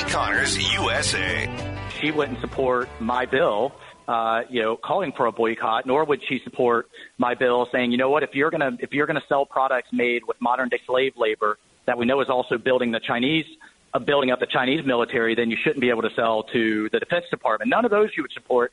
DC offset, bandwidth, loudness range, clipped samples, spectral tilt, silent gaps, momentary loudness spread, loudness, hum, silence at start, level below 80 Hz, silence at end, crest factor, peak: under 0.1%; 11 kHz; 2 LU; under 0.1%; -4 dB/octave; none; 5 LU; -23 LUFS; none; 0 s; -50 dBFS; 0.05 s; 14 dB; -8 dBFS